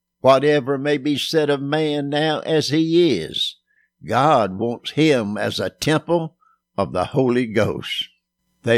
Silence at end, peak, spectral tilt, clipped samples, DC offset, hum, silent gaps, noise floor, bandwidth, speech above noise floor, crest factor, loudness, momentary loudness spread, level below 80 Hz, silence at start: 0 s; -2 dBFS; -5.5 dB/octave; under 0.1%; under 0.1%; none; none; -69 dBFS; 15 kHz; 50 dB; 18 dB; -20 LUFS; 8 LU; -58 dBFS; 0.25 s